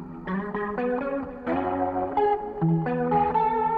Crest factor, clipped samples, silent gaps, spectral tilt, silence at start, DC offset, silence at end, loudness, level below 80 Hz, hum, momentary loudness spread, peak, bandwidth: 12 dB; under 0.1%; none; -10.5 dB/octave; 0 s; under 0.1%; 0 s; -26 LUFS; -50 dBFS; none; 8 LU; -12 dBFS; 4.8 kHz